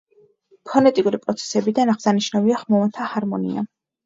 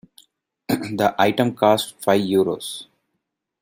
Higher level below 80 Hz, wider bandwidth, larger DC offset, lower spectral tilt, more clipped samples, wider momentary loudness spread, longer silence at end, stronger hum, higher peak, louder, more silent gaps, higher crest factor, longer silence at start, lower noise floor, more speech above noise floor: about the same, -66 dBFS vs -62 dBFS; second, 7.8 kHz vs 16.5 kHz; neither; about the same, -5.5 dB/octave vs -5 dB/octave; neither; second, 8 LU vs 12 LU; second, 0.4 s vs 0.8 s; neither; about the same, -2 dBFS vs -2 dBFS; about the same, -20 LUFS vs -20 LUFS; neither; about the same, 20 dB vs 20 dB; about the same, 0.65 s vs 0.7 s; second, -55 dBFS vs -78 dBFS; second, 36 dB vs 58 dB